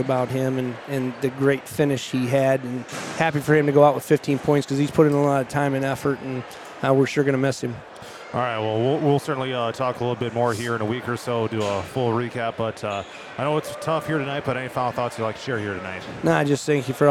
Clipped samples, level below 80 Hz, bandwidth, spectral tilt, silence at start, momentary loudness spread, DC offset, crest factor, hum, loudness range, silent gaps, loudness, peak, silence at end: under 0.1%; -60 dBFS; 15.5 kHz; -6 dB/octave; 0 s; 10 LU; under 0.1%; 20 dB; none; 6 LU; none; -23 LUFS; -2 dBFS; 0 s